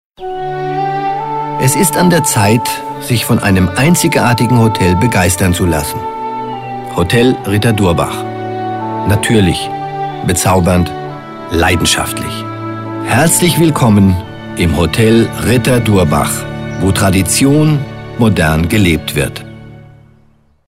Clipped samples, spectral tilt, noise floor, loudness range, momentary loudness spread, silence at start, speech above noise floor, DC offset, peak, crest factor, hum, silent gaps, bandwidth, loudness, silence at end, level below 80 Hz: under 0.1%; -5 dB/octave; -49 dBFS; 3 LU; 11 LU; 0.2 s; 38 dB; under 0.1%; 0 dBFS; 12 dB; none; none; 16.5 kHz; -12 LUFS; 0.85 s; -32 dBFS